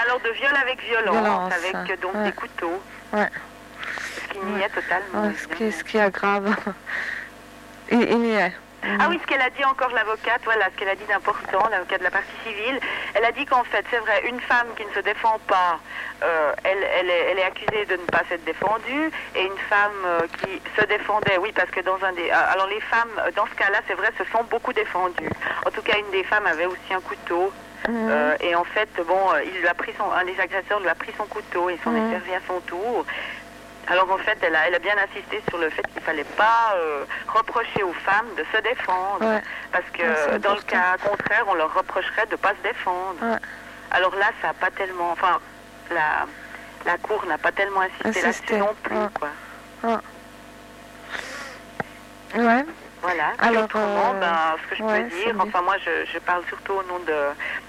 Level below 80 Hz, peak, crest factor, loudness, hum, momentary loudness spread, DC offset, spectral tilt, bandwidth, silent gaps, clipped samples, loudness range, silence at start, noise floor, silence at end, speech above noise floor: -56 dBFS; -8 dBFS; 16 dB; -23 LUFS; 50 Hz at -55 dBFS; 10 LU; under 0.1%; -4 dB/octave; 16 kHz; none; under 0.1%; 4 LU; 0 s; -43 dBFS; 0 s; 20 dB